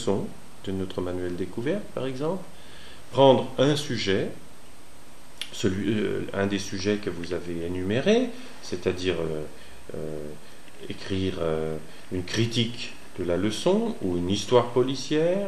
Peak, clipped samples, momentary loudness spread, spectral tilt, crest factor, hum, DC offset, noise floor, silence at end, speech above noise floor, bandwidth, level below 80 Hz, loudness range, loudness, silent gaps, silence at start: -6 dBFS; under 0.1%; 17 LU; -5.5 dB/octave; 22 dB; none; 2%; -50 dBFS; 0 s; 24 dB; 14 kHz; -54 dBFS; 6 LU; -27 LUFS; none; 0 s